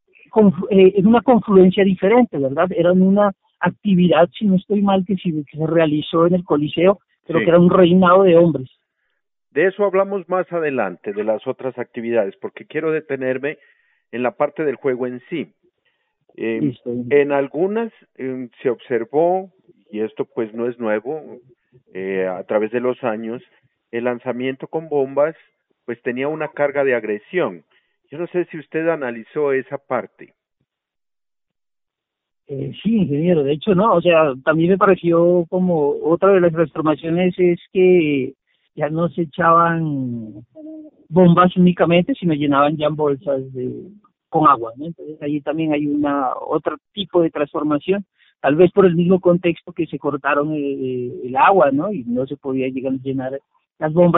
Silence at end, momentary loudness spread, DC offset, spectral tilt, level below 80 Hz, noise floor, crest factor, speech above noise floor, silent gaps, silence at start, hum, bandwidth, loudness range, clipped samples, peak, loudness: 0 s; 14 LU; under 0.1%; -6.5 dB/octave; -56 dBFS; under -90 dBFS; 16 dB; over 73 dB; none; 0.35 s; none; 4 kHz; 9 LU; under 0.1%; -2 dBFS; -18 LUFS